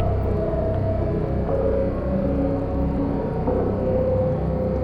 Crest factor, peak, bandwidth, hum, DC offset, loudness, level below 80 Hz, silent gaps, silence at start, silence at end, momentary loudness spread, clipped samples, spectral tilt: 12 dB; -10 dBFS; 5.2 kHz; none; under 0.1%; -23 LUFS; -28 dBFS; none; 0 s; 0 s; 2 LU; under 0.1%; -11 dB/octave